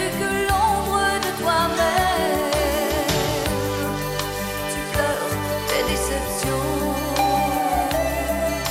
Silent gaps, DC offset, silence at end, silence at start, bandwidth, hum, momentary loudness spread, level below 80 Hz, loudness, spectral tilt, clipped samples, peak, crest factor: none; under 0.1%; 0 s; 0 s; 16.5 kHz; none; 5 LU; -34 dBFS; -22 LUFS; -4 dB/octave; under 0.1%; -8 dBFS; 14 dB